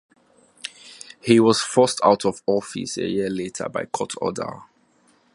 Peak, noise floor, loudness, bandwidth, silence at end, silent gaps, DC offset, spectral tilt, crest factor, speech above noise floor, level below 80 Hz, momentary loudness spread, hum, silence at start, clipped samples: -2 dBFS; -60 dBFS; -21 LUFS; 11.5 kHz; 0.7 s; none; under 0.1%; -4.5 dB/octave; 20 dB; 39 dB; -60 dBFS; 19 LU; none; 0.65 s; under 0.1%